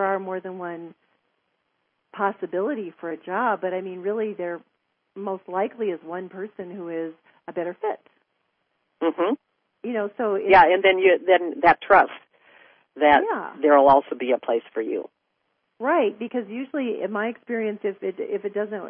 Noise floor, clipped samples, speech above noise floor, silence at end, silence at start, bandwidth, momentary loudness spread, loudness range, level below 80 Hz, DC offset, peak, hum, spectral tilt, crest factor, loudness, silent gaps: -74 dBFS; under 0.1%; 51 dB; 0 s; 0 s; 5.6 kHz; 18 LU; 12 LU; -60 dBFS; under 0.1%; -4 dBFS; none; -9.5 dB/octave; 20 dB; -23 LUFS; none